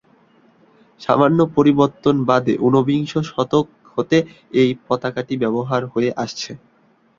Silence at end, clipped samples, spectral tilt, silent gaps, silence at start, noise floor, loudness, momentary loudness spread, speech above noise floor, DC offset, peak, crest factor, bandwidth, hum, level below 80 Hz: 0.6 s; under 0.1%; -7 dB/octave; none; 1 s; -54 dBFS; -18 LUFS; 11 LU; 36 dB; under 0.1%; -2 dBFS; 18 dB; 7.6 kHz; none; -56 dBFS